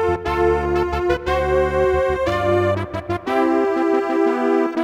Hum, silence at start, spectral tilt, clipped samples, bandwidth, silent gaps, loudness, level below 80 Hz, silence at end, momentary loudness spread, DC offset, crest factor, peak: none; 0 s; -7 dB/octave; under 0.1%; 12.5 kHz; none; -19 LUFS; -34 dBFS; 0 s; 3 LU; under 0.1%; 12 dB; -6 dBFS